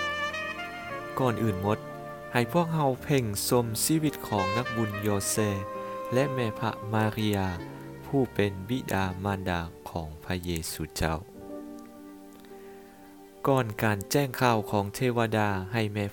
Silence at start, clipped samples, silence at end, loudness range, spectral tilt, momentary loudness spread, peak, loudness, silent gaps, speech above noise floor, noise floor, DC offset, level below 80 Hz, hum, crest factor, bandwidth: 0 s; under 0.1%; 0 s; 6 LU; -5 dB/octave; 16 LU; -10 dBFS; -29 LUFS; none; 22 dB; -50 dBFS; under 0.1%; -52 dBFS; none; 20 dB; 19 kHz